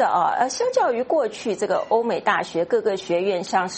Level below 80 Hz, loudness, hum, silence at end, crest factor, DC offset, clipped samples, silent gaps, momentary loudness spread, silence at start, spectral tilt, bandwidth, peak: -66 dBFS; -22 LUFS; none; 0 s; 18 dB; under 0.1%; under 0.1%; none; 3 LU; 0 s; -4 dB/octave; 8.8 kHz; -4 dBFS